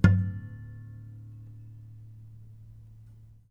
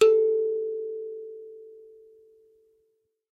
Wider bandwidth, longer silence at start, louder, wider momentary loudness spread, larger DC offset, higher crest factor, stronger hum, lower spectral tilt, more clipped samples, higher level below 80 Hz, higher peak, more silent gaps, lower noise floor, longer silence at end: second, 6.8 kHz vs 8 kHz; about the same, 0.05 s vs 0 s; second, -33 LUFS vs -27 LUFS; second, 20 LU vs 24 LU; neither; first, 26 dB vs 20 dB; neither; first, -9 dB/octave vs -2.5 dB/octave; neither; first, -46 dBFS vs -78 dBFS; first, -4 dBFS vs -8 dBFS; neither; second, -52 dBFS vs -73 dBFS; first, 1.85 s vs 1.6 s